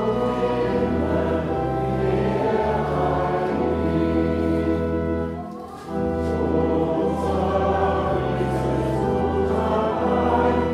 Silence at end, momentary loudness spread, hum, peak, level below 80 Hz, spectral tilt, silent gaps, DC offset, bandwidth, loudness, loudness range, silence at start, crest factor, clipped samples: 0 s; 3 LU; none; -6 dBFS; -36 dBFS; -8 dB/octave; none; under 0.1%; 12.5 kHz; -22 LUFS; 2 LU; 0 s; 14 dB; under 0.1%